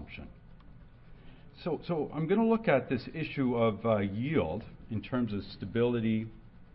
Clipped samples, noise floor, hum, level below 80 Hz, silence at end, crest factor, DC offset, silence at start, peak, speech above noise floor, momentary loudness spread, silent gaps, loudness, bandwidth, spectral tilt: under 0.1%; -52 dBFS; none; -54 dBFS; 0.1 s; 18 dB; under 0.1%; 0 s; -14 dBFS; 22 dB; 13 LU; none; -31 LUFS; 5.6 kHz; -11 dB/octave